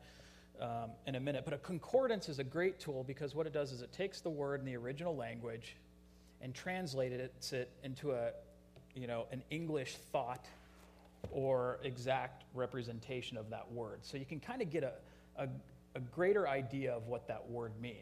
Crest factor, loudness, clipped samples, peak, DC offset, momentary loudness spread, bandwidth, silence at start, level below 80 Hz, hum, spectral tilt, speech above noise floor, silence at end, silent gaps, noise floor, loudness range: 20 dB; -41 LUFS; under 0.1%; -22 dBFS; under 0.1%; 14 LU; 15 kHz; 0 s; -68 dBFS; none; -6 dB/octave; 22 dB; 0 s; none; -63 dBFS; 4 LU